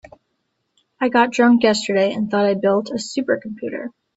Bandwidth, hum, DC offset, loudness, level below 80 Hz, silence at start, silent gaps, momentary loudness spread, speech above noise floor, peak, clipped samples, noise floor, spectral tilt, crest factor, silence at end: 8 kHz; none; under 0.1%; -18 LUFS; -62 dBFS; 1 s; none; 14 LU; 54 dB; 0 dBFS; under 0.1%; -72 dBFS; -5 dB/octave; 18 dB; 0.25 s